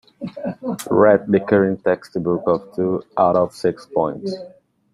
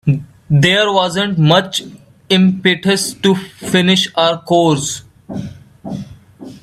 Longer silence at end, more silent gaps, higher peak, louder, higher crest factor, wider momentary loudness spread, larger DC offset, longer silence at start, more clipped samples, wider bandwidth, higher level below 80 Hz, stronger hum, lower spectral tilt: first, 0.45 s vs 0.05 s; neither; about the same, 0 dBFS vs 0 dBFS; second, -19 LUFS vs -14 LUFS; about the same, 18 dB vs 14 dB; about the same, 14 LU vs 16 LU; neither; first, 0.2 s vs 0.05 s; neither; about the same, 14.5 kHz vs 14.5 kHz; second, -58 dBFS vs -50 dBFS; neither; first, -7 dB/octave vs -5 dB/octave